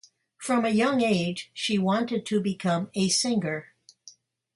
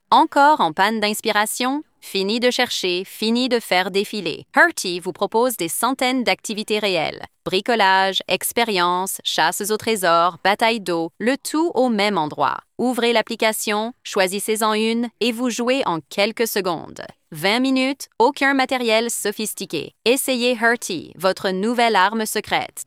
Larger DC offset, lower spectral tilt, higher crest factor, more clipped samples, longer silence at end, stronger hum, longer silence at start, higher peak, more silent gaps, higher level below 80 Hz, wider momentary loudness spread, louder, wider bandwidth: neither; first, -4.5 dB/octave vs -3 dB/octave; about the same, 14 dB vs 18 dB; neither; first, 0.45 s vs 0.05 s; neither; first, 0.4 s vs 0.1 s; second, -12 dBFS vs -2 dBFS; neither; about the same, -68 dBFS vs -64 dBFS; about the same, 8 LU vs 8 LU; second, -26 LUFS vs -19 LUFS; second, 11.5 kHz vs 16.5 kHz